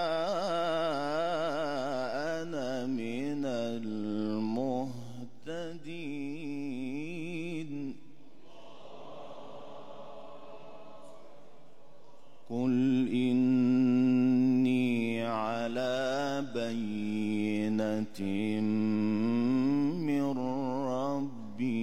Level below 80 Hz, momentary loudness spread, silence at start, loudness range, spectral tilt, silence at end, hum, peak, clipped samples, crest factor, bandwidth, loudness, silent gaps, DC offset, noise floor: -74 dBFS; 21 LU; 0 s; 19 LU; -7 dB/octave; 0 s; none; -18 dBFS; under 0.1%; 14 dB; 9.8 kHz; -31 LUFS; none; 0.7%; -59 dBFS